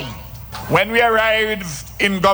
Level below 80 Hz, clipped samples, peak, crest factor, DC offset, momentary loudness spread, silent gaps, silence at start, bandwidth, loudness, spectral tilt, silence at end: -40 dBFS; under 0.1%; -2 dBFS; 16 dB; under 0.1%; 17 LU; none; 0 s; over 20 kHz; -16 LUFS; -4 dB/octave; 0 s